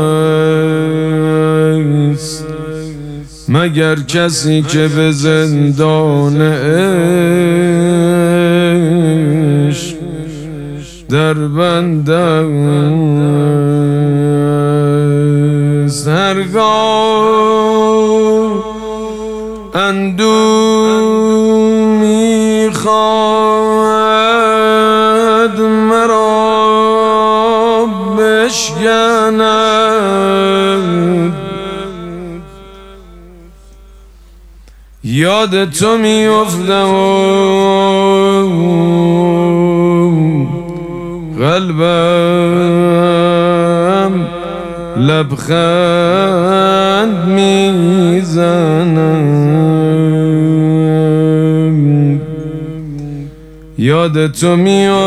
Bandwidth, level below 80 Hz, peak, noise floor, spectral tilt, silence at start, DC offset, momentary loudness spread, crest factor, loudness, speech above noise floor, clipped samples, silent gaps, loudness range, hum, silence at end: 13.5 kHz; -40 dBFS; 0 dBFS; -37 dBFS; -6 dB/octave; 0 s; under 0.1%; 12 LU; 10 dB; -11 LUFS; 28 dB; under 0.1%; none; 4 LU; none; 0 s